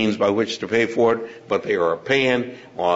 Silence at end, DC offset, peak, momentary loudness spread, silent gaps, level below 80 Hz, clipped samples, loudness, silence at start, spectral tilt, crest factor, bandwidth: 0 s; under 0.1%; -4 dBFS; 7 LU; none; -62 dBFS; under 0.1%; -21 LUFS; 0 s; -5 dB/octave; 16 dB; 8 kHz